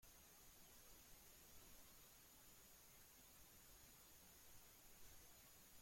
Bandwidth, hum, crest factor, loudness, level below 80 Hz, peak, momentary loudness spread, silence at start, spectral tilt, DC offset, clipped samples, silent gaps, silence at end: 16.5 kHz; none; 14 dB; -65 LUFS; -76 dBFS; -52 dBFS; 1 LU; 0 s; -2 dB/octave; under 0.1%; under 0.1%; none; 0 s